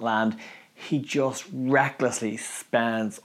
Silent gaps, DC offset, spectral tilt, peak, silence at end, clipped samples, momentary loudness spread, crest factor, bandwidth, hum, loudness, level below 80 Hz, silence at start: none; under 0.1%; -4.5 dB/octave; -8 dBFS; 0.05 s; under 0.1%; 12 LU; 20 dB; 15.5 kHz; none; -26 LUFS; -82 dBFS; 0 s